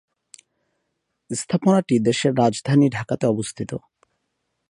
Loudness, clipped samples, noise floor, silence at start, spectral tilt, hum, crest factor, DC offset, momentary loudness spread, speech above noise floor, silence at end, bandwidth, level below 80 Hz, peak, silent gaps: -21 LUFS; under 0.1%; -76 dBFS; 1.3 s; -6 dB/octave; none; 18 dB; under 0.1%; 13 LU; 56 dB; 0.9 s; 11 kHz; -60 dBFS; -4 dBFS; none